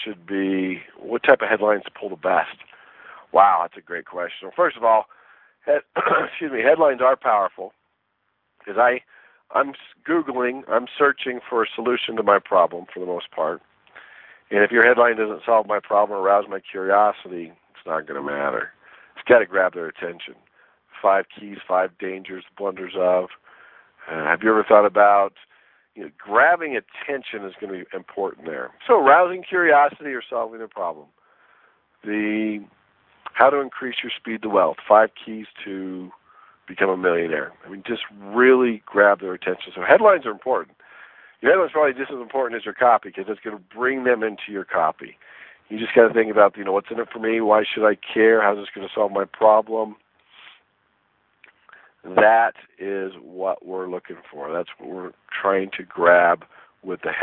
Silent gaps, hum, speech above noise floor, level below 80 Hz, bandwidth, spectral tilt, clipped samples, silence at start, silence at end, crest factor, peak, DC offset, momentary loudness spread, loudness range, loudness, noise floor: none; none; 51 dB; -68 dBFS; 4.1 kHz; -8.5 dB/octave; under 0.1%; 0 s; 0 s; 20 dB; 0 dBFS; under 0.1%; 17 LU; 6 LU; -20 LUFS; -72 dBFS